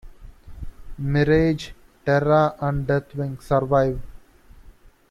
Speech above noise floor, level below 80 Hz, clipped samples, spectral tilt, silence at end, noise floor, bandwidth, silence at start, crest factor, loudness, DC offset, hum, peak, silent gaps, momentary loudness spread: 28 dB; -40 dBFS; under 0.1%; -8 dB/octave; 0.4 s; -49 dBFS; 11.5 kHz; 0.05 s; 18 dB; -22 LUFS; under 0.1%; none; -6 dBFS; none; 21 LU